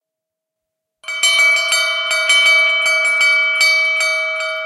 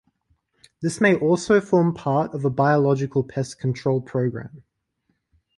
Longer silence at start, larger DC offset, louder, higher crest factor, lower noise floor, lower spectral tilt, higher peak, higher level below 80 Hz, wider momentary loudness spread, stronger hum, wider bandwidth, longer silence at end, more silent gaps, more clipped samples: first, 1.05 s vs 0.8 s; neither; first, -12 LUFS vs -21 LUFS; about the same, 14 dB vs 18 dB; first, -82 dBFS vs -72 dBFS; second, 4.5 dB/octave vs -7 dB/octave; first, -2 dBFS vs -6 dBFS; second, -74 dBFS vs -58 dBFS; second, 6 LU vs 10 LU; neither; first, 14.5 kHz vs 11.5 kHz; second, 0 s vs 1 s; neither; neither